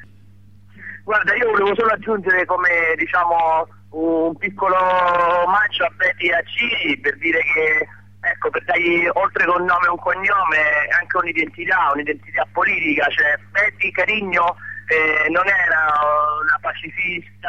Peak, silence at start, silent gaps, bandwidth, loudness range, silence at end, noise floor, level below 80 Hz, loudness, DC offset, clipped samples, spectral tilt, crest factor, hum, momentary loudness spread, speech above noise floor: -6 dBFS; 0 s; none; 8.4 kHz; 1 LU; 0 s; -48 dBFS; -58 dBFS; -17 LUFS; 0.4%; under 0.1%; -5 dB/octave; 12 dB; 50 Hz at -45 dBFS; 7 LU; 29 dB